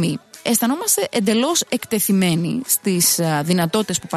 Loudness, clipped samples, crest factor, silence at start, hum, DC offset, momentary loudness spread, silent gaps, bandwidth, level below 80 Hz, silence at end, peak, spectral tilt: -18 LUFS; under 0.1%; 14 dB; 0 s; none; under 0.1%; 5 LU; none; 13.5 kHz; -60 dBFS; 0 s; -4 dBFS; -4 dB/octave